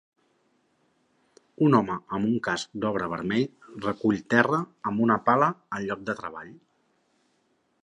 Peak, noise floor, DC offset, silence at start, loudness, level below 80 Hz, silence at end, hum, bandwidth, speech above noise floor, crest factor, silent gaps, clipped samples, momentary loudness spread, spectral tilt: -4 dBFS; -70 dBFS; under 0.1%; 1.6 s; -26 LUFS; -64 dBFS; 1.3 s; none; 10.5 kHz; 45 dB; 22 dB; none; under 0.1%; 12 LU; -6.5 dB/octave